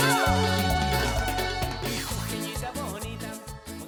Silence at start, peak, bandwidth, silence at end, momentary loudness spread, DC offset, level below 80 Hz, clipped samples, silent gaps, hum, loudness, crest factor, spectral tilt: 0 s; -12 dBFS; over 20 kHz; 0 s; 13 LU; under 0.1%; -36 dBFS; under 0.1%; none; none; -27 LUFS; 16 dB; -4 dB/octave